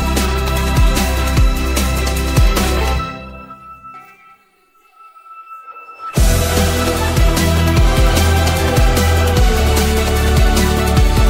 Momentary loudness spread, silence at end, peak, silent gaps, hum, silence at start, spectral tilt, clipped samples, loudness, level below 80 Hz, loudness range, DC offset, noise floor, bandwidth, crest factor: 20 LU; 0 s; -2 dBFS; none; none; 0 s; -5 dB/octave; under 0.1%; -15 LUFS; -16 dBFS; 10 LU; under 0.1%; -53 dBFS; 16.5 kHz; 12 dB